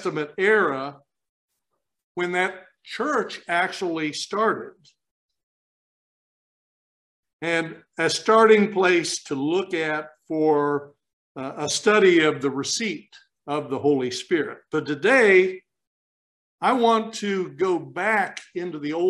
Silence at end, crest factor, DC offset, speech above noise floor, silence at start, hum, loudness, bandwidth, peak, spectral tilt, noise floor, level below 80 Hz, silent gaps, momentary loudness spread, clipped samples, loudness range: 0 s; 20 dB; under 0.1%; 57 dB; 0 s; none; -22 LUFS; 12 kHz; -4 dBFS; -4 dB/octave; -79 dBFS; -74 dBFS; 1.29-1.49 s, 2.03-2.15 s, 5.11-5.29 s, 5.43-7.23 s, 7.33-7.39 s, 11.13-11.35 s, 15.87-16.58 s; 14 LU; under 0.1%; 8 LU